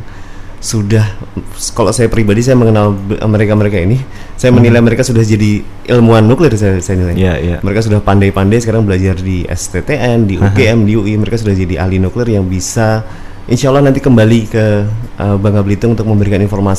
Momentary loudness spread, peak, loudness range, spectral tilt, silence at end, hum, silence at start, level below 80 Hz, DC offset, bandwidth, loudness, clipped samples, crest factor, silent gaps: 9 LU; 0 dBFS; 3 LU; -6.5 dB/octave; 0 s; none; 0 s; -26 dBFS; 3%; 13.5 kHz; -11 LUFS; 0.3%; 10 dB; none